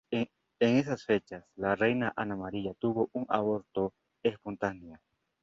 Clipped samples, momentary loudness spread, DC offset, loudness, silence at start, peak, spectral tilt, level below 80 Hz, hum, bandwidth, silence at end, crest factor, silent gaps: under 0.1%; 9 LU; under 0.1%; -32 LUFS; 0.1 s; -12 dBFS; -7 dB/octave; -64 dBFS; none; 7.6 kHz; 0.45 s; 20 dB; none